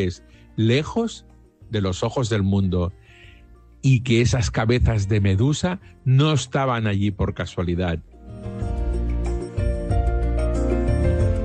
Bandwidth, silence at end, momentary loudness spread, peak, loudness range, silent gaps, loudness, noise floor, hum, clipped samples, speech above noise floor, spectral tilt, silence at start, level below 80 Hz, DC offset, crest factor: 9.2 kHz; 0 s; 10 LU; -6 dBFS; 5 LU; none; -22 LUFS; -48 dBFS; none; under 0.1%; 27 dB; -6.5 dB/octave; 0 s; -28 dBFS; under 0.1%; 14 dB